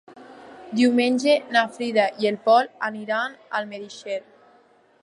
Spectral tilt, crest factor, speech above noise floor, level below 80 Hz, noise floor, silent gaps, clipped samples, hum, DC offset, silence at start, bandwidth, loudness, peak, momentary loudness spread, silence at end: -4 dB/octave; 18 dB; 35 dB; -78 dBFS; -57 dBFS; none; under 0.1%; none; under 0.1%; 0.15 s; 11.5 kHz; -22 LUFS; -6 dBFS; 13 LU; 0.85 s